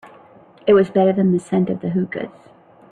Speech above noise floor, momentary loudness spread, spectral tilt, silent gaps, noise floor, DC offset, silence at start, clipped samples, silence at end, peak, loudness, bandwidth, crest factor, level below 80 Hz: 30 dB; 12 LU; -8.5 dB/octave; none; -47 dBFS; under 0.1%; 0.05 s; under 0.1%; 0.6 s; -4 dBFS; -18 LUFS; 9.4 kHz; 16 dB; -58 dBFS